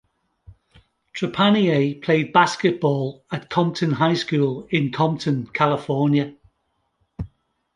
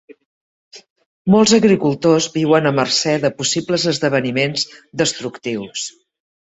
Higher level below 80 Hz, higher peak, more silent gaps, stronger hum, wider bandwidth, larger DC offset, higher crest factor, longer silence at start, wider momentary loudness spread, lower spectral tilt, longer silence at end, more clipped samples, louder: about the same, -54 dBFS vs -56 dBFS; about the same, -2 dBFS vs -2 dBFS; second, none vs 0.26-0.71 s, 0.90-0.96 s, 1.06-1.25 s; neither; first, 10.5 kHz vs 8.4 kHz; neither; about the same, 20 dB vs 16 dB; first, 0.5 s vs 0.1 s; about the same, 15 LU vs 13 LU; first, -6.5 dB/octave vs -4 dB/octave; second, 0.5 s vs 0.7 s; neither; second, -21 LUFS vs -17 LUFS